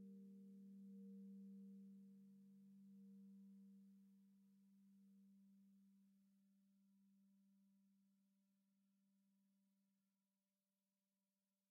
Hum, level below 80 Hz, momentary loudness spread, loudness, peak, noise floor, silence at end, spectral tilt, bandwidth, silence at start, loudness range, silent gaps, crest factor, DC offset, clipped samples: none; under -90 dBFS; 8 LU; -64 LUFS; -56 dBFS; under -90 dBFS; 1.6 s; -14 dB/octave; 1.4 kHz; 0 s; 6 LU; none; 12 dB; under 0.1%; under 0.1%